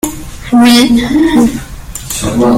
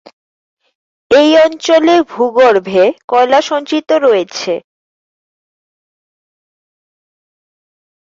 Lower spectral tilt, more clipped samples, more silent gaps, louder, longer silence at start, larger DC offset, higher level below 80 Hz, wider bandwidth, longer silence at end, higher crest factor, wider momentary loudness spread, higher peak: about the same, -4 dB/octave vs -4 dB/octave; neither; second, none vs 3.04-3.08 s; about the same, -9 LUFS vs -11 LUFS; second, 0.05 s vs 1.1 s; neither; first, -28 dBFS vs -58 dBFS; first, 16.5 kHz vs 7.8 kHz; second, 0 s vs 3.55 s; about the same, 10 dB vs 12 dB; first, 19 LU vs 8 LU; about the same, 0 dBFS vs 0 dBFS